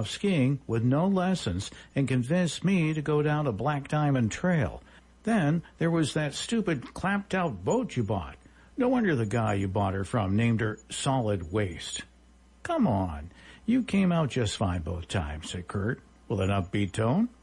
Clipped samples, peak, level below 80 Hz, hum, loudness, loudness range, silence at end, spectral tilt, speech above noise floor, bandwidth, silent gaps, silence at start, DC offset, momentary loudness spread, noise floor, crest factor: under 0.1%; -16 dBFS; -52 dBFS; none; -28 LUFS; 3 LU; 0.15 s; -6 dB/octave; 30 dB; 11.5 kHz; none; 0 s; under 0.1%; 9 LU; -57 dBFS; 12 dB